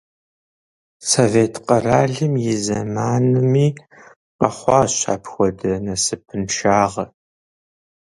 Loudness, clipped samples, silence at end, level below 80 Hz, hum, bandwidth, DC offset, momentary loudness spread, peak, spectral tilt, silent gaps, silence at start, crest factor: -18 LUFS; under 0.1%; 1.1 s; -48 dBFS; none; 11.5 kHz; under 0.1%; 8 LU; 0 dBFS; -5 dB/octave; 4.16-4.39 s; 1 s; 20 dB